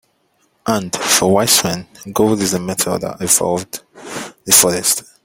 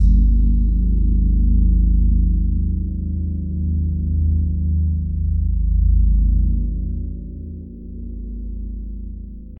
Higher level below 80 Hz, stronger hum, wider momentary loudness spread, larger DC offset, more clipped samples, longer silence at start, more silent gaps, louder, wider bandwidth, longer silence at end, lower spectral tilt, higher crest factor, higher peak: second, -52 dBFS vs -18 dBFS; neither; first, 18 LU vs 15 LU; neither; neither; first, 0.65 s vs 0 s; neither; first, -14 LUFS vs -20 LUFS; first, 17 kHz vs 0.6 kHz; first, 0.2 s vs 0.05 s; second, -2.5 dB/octave vs -14 dB/octave; first, 18 dB vs 12 dB; first, 0 dBFS vs -6 dBFS